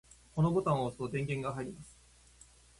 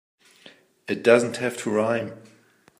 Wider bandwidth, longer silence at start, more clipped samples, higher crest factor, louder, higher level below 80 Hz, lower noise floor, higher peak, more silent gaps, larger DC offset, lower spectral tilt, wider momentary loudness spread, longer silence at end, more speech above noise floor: second, 11.5 kHz vs 15.5 kHz; about the same, 0.35 s vs 0.45 s; neither; about the same, 20 dB vs 22 dB; second, -34 LUFS vs -23 LUFS; first, -60 dBFS vs -72 dBFS; first, -60 dBFS vs -53 dBFS; second, -16 dBFS vs -2 dBFS; neither; neither; first, -7.5 dB/octave vs -5 dB/octave; about the same, 16 LU vs 16 LU; first, 0.9 s vs 0.6 s; about the same, 27 dB vs 30 dB